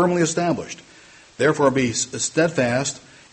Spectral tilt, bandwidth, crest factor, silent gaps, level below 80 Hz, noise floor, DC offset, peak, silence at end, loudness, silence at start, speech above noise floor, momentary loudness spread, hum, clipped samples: -4 dB/octave; 8.8 kHz; 18 dB; none; -56 dBFS; -48 dBFS; under 0.1%; -4 dBFS; 0.35 s; -21 LUFS; 0 s; 27 dB; 13 LU; none; under 0.1%